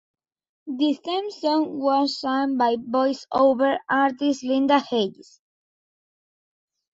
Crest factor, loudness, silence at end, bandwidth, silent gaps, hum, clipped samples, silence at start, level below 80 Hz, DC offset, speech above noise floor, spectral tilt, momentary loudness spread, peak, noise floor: 16 dB; -22 LUFS; 1.7 s; 7.8 kHz; none; none; under 0.1%; 0.65 s; -70 dBFS; under 0.1%; over 68 dB; -4.5 dB/octave; 6 LU; -8 dBFS; under -90 dBFS